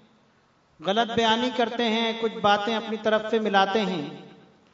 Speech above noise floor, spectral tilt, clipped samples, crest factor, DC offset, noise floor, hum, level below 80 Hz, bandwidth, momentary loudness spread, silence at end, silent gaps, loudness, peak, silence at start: 38 dB; -4.5 dB/octave; under 0.1%; 18 dB; under 0.1%; -62 dBFS; none; -68 dBFS; 7.8 kHz; 9 LU; 0.45 s; none; -24 LUFS; -6 dBFS; 0.8 s